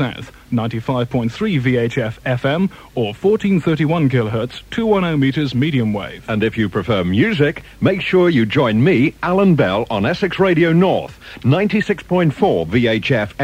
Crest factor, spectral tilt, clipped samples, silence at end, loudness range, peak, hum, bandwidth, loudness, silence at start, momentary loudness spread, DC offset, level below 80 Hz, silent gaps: 14 dB; -7.5 dB/octave; under 0.1%; 0 s; 3 LU; -2 dBFS; none; 15 kHz; -17 LUFS; 0 s; 8 LU; under 0.1%; -44 dBFS; none